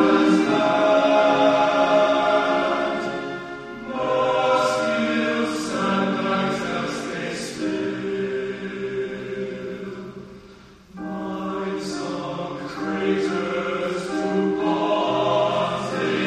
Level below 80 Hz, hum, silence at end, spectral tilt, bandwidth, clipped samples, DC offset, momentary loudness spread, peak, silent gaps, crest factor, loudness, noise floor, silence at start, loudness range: -58 dBFS; none; 0 s; -5 dB/octave; 12.5 kHz; under 0.1%; under 0.1%; 13 LU; -6 dBFS; none; 16 dB; -22 LUFS; -46 dBFS; 0 s; 11 LU